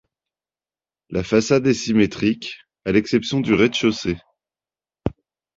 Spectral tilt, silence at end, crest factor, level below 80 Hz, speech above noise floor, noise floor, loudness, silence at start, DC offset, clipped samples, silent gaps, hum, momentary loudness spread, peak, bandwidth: -5.5 dB/octave; 0.45 s; 18 dB; -48 dBFS; over 71 dB; under -90 dBFS; -20 LUFS; 1.1 s; under 0.1%; under 0.1%; none; none; 13 LU; -4 dBFS; 7.8 kHz